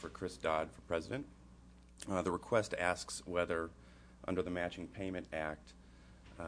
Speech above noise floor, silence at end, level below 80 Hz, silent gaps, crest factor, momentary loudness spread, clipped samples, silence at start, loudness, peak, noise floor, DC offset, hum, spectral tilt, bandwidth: 20 dB; 0 s; -60 dBFS; none; 24 dB; 16 LU; under 0.1%; 0 s; -39 LUFS; -16 dBFS; -59 dBFS; under 0.1%; none; -5 dB/octave; 11 kHz